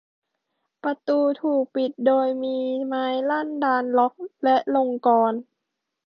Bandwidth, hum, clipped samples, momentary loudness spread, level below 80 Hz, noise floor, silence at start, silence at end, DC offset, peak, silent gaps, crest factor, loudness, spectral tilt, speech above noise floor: 6 kHz; none; under 0.1%; 6 LU; -76 dBFS; -81 dBFS; 0.85 s; 0.65 s; under 0.1%; -6 dBFS; none; 16 dB; -23 LUFS; -7 dB/octave; 59 dB